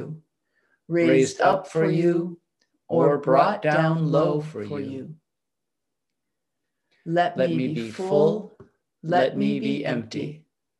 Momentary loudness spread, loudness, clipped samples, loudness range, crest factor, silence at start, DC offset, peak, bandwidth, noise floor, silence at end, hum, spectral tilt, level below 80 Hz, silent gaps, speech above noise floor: 15 LU; -23 LUFS; under 0.1%; 7 LU; 20 dB; 0 s; under 0.1%; -4 dBFS; 11 kHz; -85 dBFS; 0.4 s; none; -6.5 dB/octave; -70 dBFS; none; 63 dB